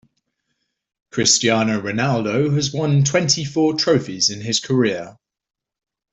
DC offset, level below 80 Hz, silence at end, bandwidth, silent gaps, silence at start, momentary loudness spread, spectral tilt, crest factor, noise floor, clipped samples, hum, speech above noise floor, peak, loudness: under 0.1%; -56 dBFS; 1 s; 8.4 kHz; none; 1.15 s; 6 LU; -4 dB/octave; 18 dB; -74 dBFS; under 0.1%; none; 56 dB; -2 dBFS; -18 LUFS